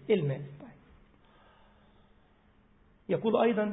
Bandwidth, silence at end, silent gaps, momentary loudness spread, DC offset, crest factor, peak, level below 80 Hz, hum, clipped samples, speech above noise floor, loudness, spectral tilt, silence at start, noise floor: 4 kHz; 0 s; none; 24 LU; under 0.1%; 22 dB; -12 dBFS; -66 dBFS; none; under 0.1%; 35 dB; -30 LUFS; -10.5 dB/octave; 0.05 s; -64 dBFS